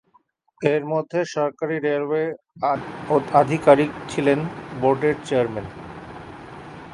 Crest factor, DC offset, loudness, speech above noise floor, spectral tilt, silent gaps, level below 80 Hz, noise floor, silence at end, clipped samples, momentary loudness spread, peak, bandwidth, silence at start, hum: 22 dB; under 0.1%; -22 LUFS; 41 dB; -6.5 dB/octave; none; -56 dBFS; -61 dBFS; 0 s; under 0.1%; 20 LU; -2 dBFS; 11.5 kHz; 0.6 s; none